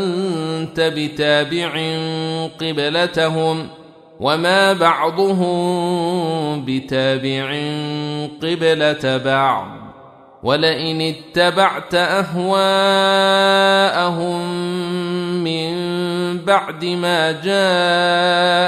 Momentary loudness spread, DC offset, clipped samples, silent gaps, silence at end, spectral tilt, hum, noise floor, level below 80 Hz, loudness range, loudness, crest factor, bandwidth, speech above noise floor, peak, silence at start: 9 LU; under 0.1%; under 0.1%; none; 0 s; -5 dB/octave; none; -43 dBFS; -58 dBFS; 4 LU; -17 LUFS; 16 dB; 14.5 kHz; 26 dB; -2 dBFS; 0 s